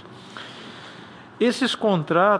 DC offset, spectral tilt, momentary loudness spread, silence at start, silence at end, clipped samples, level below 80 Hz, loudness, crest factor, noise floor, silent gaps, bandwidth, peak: under 0.1%; -5.5 dB/octave; 20 LU; 0 s; 0 s; under 0.1%; -70 dBFS; -21 LUFS; 18 dB; -43 dBFS; none; 10.5 kHz; -6 dBFS